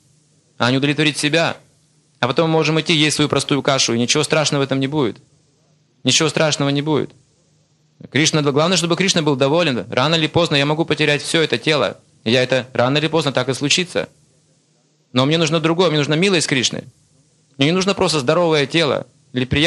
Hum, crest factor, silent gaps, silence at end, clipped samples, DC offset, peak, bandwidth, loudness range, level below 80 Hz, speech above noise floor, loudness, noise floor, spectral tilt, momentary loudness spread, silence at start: none; 18 dB; none; 0 s; under 0.1%; under 0.1%; 0 dBFS; 12.5 kHz; 3 LU; -52 dBFS; 43 dB; -17 LUFS; -60 dBFS; -4 dB/octave; 7 LU; 0.6 s